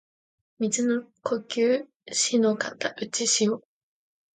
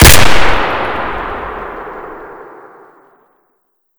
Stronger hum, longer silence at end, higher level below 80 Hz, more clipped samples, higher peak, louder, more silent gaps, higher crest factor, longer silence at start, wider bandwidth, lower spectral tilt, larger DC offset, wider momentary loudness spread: neither; first, 0.75 s vs 0 s; second, -76 dBFS vs -20 dBFS; second, under 0.1% vs 6%; second, -10 dBFS vs 0 dBFS; second, -26 LUFS vs -13 LUFS; first, 1.96-2.00 s vs none; first, 18 dB vs 12 dB; first, 0.6 s vs 0 s; second, 9.6 kHz vs over 20 kHz; about the same, -2.5 dB/octave vs -3 dB/octave; neither; second, 8 LU vs 23 LU